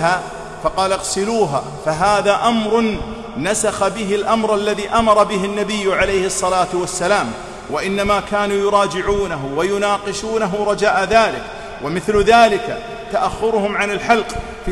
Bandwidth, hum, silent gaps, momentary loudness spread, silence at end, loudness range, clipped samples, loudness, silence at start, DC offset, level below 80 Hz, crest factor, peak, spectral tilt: 14.5 kHz; none; none; 10 LU; 0 s; 2 LU; under 0.1%; -17 LUFS; 0 s; under 0.1%; -38 dBFS; 16 dB; -2 dBFS; -4 dB/octave